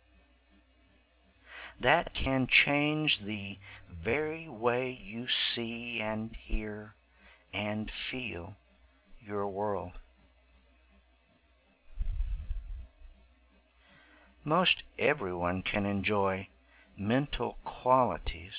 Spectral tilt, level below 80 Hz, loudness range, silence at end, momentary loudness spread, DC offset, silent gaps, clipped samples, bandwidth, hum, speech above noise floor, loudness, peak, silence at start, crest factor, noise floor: -2.5 dB/octave; -46 dBFS; 16 LU; 0 s; 17 LU; under 0.1%; none; under 0.1%; 4 kHz; none; 35 dB; -31 LUFS; -10 dBFS; 1.45 s; 24 dB; -67 dBFS